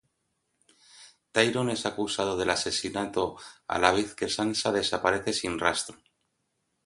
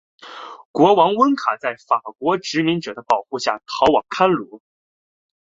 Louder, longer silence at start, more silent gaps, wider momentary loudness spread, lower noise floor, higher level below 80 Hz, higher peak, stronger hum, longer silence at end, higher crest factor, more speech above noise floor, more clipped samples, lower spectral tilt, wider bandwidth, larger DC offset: second, -27 LUFS vs -19 LUFS; first, 0.95 s vs 0.25 s; second, none vs 0.65-0.74 s; second, 7 LU vs 18 LU; second, -77 dBFS vs under -90 dBFS; about the same, -58 dBFS vs -58 dBFS; about the same, -4 dBFS vs -2 dBFS; neither; about the same, 0.9 s vs 0.9 s; first, 26 dB vs 18 dB; second, 49 dB vs over 72 dB; neither; second, -3 dB/octave vs -5 dB/octave; first, 11.5 kHz vs 8 kHz; neither